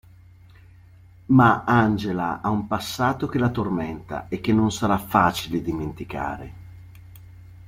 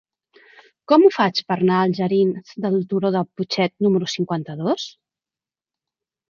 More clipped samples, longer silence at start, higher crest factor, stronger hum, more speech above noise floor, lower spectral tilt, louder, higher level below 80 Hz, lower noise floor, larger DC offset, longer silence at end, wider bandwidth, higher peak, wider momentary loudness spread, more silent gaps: neither; first, 1.3 s vs 0.9 s; about the same, 22 dB vs 18 dB; neither; second, 27 dB vs over 71 dB; about the same, -6.5 dB/octave vs -6.5 dB/octave; second, -23 LUFS vs -20 LUFS; first, -48 dBFS vs -68 dBFS; second, -49 dBFS vs under -90 dBFS; neither; second, 0 s vs 1.4 s; first, 16.5 kHz vs 7.2 kHz; about the same, -2 dBFS vs -2 dBFS; first, 14 LU vs 10 LU; neither